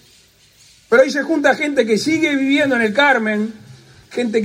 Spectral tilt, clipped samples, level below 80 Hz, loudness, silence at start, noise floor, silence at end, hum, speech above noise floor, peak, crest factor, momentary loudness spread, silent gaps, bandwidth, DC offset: -4.5 dB/octave; under 0.1%; -62 dBFS; -16 LUFS; 0.9 s; -51 dBFS; 0 s; none; 35 dB; -2 dBFS; 16 dB; 9 LU; none; 15.5 kHz; under 0.1%